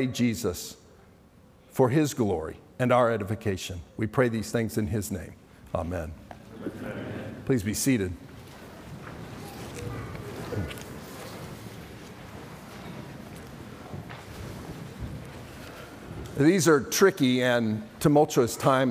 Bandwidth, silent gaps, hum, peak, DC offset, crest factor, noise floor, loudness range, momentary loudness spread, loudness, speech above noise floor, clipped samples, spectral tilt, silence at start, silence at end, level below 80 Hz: 16.5 kHz; none; none; -8 dBFS; under 0.1%; 20 dB; -55 dBFS; 16 LU; 21 LU; -27 LUFS; 30 dB; under 0.1%; -5.5 dB/octave; 0 s; 0 s; -54 dBFS